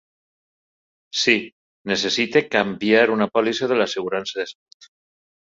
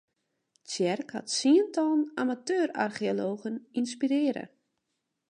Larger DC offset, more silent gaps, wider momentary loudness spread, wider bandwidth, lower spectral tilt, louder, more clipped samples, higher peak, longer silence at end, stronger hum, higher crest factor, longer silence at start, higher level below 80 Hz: neither; first, 1.52-1.85 s vs none; about the same, 12 LU vs 11 LU; second, 7.8 kHz vs 10.5 kHz; about the same, -3.5 dB/octave vs -4 dB/octave; first, -20 LUFS vs -29 LUFS; neither; first, -2 dBFS vs -12 dBFS; first, 1.05 s vs 0.85 s; neither; about the same, 22 dB vs 18 dB; first, 1.15 s vs 0.7 s; first, -64 dBFS vs -80 dBFS